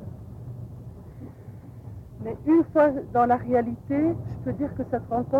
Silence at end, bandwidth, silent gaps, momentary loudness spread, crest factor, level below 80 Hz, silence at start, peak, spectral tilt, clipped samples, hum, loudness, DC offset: 0 s; 4.4 kHz; none; 21 LU; 16 dB; -50 dBFS; 0 s; -10 dBFS; -10 dB/octave; under 0.1%; none; -24 LUFS; under 0.1%